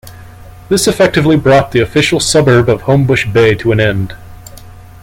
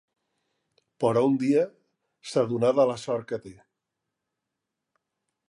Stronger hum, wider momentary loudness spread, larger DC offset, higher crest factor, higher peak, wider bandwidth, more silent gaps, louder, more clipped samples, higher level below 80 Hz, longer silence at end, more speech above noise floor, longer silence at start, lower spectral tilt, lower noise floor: neither; second, 5 LU vs 12 LU; neither; second, 12 dB vs 18 dB; first, 0 dBFS vs -10 dBFS; first, 17 kHz vs 11.5 kHz; neither; first, -10 LUFS vs -25 LUFS; neither; first, -36 dBFS vs -72 dBFS; second, 0.2 s vs 2 s; second, 23 dB vs 60 dB; second, 0.05 s vs 1 s; second, -5 dB/octave vs -6.5 dB/octave; second, -33 dBFS vs -85 dBFS